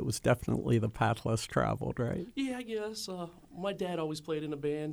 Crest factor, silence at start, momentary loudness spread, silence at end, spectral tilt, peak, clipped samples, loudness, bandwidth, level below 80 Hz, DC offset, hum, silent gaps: 18 dB; 0 s; 9 LU; 0 s; -6 dB/octave; -14 dBFS; under 0.1%; -34 LUFS; over 20 kHz; -54 dBFS; under 0.1%; none; none